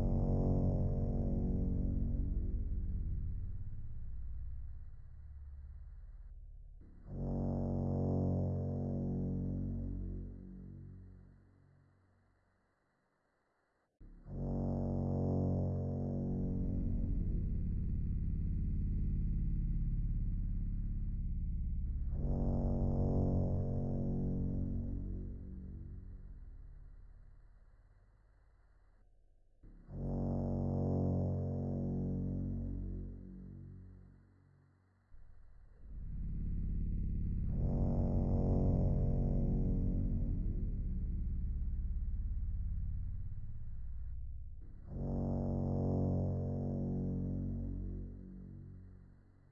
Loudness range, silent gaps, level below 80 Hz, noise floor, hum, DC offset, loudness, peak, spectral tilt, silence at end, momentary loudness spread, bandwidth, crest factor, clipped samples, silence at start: 14 LU; none; -42 dBFS; -79 dBFS; none; under 0.1%; -39 LUFS; -22 dBFS; -13.5 dB/octave; 0.4 s; 18 LU; 2.1 kHz; 16 dB; under 0.1%; 0 s